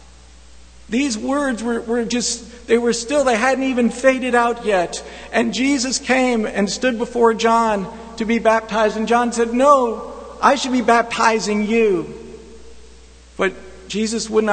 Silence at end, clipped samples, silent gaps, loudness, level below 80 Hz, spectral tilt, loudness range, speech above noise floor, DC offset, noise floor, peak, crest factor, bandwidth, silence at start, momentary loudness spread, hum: 0 s; under 0.1%; none; -18 LUFS; -46 dBFS; -3.5 dB/octave; 3 LU; 27 dB; under 0.1%; -44 dBFS; 0 dBFS; 18 dB; 9.4 kHz; 0.8 s; 9 LU; none